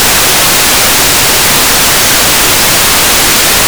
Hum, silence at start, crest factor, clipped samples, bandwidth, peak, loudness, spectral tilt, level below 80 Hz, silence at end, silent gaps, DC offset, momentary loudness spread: none; 0 s; 6 dB; 9%; over 20 kHz; 0 dBFS; -4 LUFS; -0.5 dB/octave; -26 dBFS; 0 s; none; 4%; 0 LU